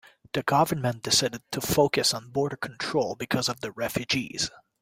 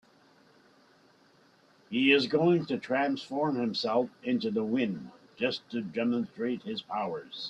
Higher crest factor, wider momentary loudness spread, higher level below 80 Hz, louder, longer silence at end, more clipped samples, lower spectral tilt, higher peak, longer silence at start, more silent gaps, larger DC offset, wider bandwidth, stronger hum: about the same, 20 dB vs 22 dB; second, 8 LU vs 11 LU; first, -58 dBFS vs -74 dBFS; first, -26 LUFS vs -30 LUFS; first, 0.35 s vs 0 s; neither; second, -3.5 dB/octave vs -6.5 dB/octave; about the same, -8 dBFS vs -10 dBFS; second, 0.35 s vs 1.9 s; neither; neither; first, 16.5 kHz vs 8.6 kHz; neither